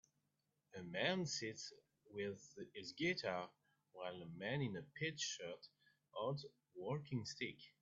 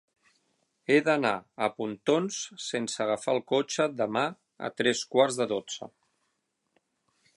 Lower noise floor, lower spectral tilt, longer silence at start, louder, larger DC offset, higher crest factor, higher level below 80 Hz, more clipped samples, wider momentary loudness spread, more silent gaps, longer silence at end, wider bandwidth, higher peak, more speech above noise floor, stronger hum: first, -87 dBFS vs -78 dBFS; about the same, -3.5 dB/octave vs -3.5 dB/octave; second, 0.75 s vs 0.9 s; second, -46 LUFS vs -28 LUFS; neither; about the same, 22 dB vs 20 dB; second, -82 dBFS vs -76 dBFS; neither; first, 15 LU vs 12 LU; neither; second, 0.1 s vs 1.5 s; second, 7.4 kHz vs 11.5 kHz; second, -24 dBFS vs -8 dBFS; second, 41 dB vs 50 dB; neither